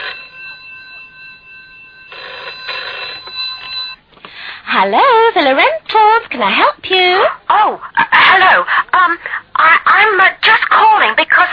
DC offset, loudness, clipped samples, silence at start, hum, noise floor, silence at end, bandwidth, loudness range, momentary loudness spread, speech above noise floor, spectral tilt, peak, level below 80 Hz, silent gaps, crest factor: under 0.1%; -10 LUFS; under 0.1%; 0 s; none; -38 dBFS; 0 s; 5.4 kHz; 15 LU; 20 LU; 28 dB; -4.5 dB/octave; 0 dBFS; -54 dBFS; none; 12 dB